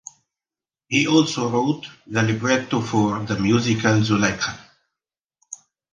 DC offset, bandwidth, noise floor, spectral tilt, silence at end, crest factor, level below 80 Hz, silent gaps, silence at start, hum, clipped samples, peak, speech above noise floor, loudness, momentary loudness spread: under 0.1%; 9.8 kHz; under -90 dBFS; -5 dB/octave; 0.4 s; 20 dB; -52 dBFS; 5.25-5.29 s; 0.9 s; none; under 0.1%; -2 dBFS; over 70 dB; -20 LUFS; 18 LU